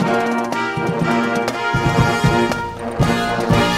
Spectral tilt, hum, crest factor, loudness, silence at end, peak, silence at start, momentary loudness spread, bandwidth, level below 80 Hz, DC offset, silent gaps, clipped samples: -6 dB/octave; none; 14 dB; -18 LUFS; 0 s; -2 dBFS; 0 s; 5 LU; 16 kHz; -34 dBFS; under 0.1%; none; under 0.1%